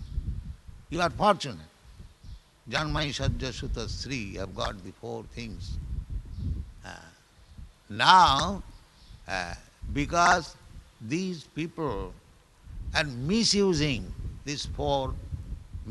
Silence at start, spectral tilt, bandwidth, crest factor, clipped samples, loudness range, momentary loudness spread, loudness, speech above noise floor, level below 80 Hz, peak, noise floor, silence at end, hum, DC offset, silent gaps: 0 s; -4 dB/octave; 12 kHz; 28 dB; under 0.1%; 11 LU; 20 LU; -28 LUFS; 26 dB; -40 dBFS; -2 dBFS; -53 dBFS; 0 s; none; under 0.1%; none